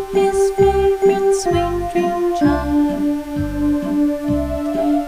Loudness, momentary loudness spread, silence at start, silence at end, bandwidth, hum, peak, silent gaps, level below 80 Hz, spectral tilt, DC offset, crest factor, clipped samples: -17 LUFS; 6 LU; 0 s; 0 s; 15.5 kHz; none; -2 dBFS; none; -32 dBFS; -6.5 dB/octave; under 0.1%; 14 dB; under 0.1%